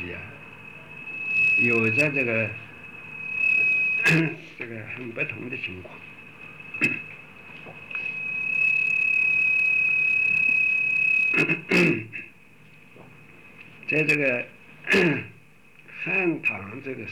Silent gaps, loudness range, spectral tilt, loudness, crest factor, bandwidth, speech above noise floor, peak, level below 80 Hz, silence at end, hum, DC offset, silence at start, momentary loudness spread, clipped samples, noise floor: none; 10 LU; -5.5 dB/octave; -21 LUFS; 14 dB; 17.5 kHz; 29 dB; -10 dBFS; -66 dBFS; 0 s; none; 0.2%; 0 s; 22 LU; under 0.1%; -54 dBFS